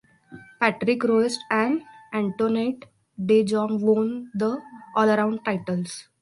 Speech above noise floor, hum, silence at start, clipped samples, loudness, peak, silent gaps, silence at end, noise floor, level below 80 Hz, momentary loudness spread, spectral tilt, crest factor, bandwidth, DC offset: 24 dB; none; 0.3 s; under 0.1%; -24 LUFS; -4 dBFS; none; 0.2 s; -47 dBFS; -68 dBFS; 9 LU; -6 dB/octave; 20 dB; 11.5 kHz; under 0.1%